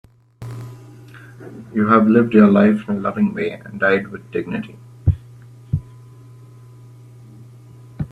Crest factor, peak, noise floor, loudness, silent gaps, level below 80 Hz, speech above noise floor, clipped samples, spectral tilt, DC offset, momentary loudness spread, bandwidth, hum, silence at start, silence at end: 20 dB; 0 dBFS; -42 dBFS; -18 LUFS; none; -42 dBFS; 25 dB; under 0.1%; -9 dB/octave; under 0.1%; 23 LU; 4.6 kHz; none; 0.4 s; 0.05 s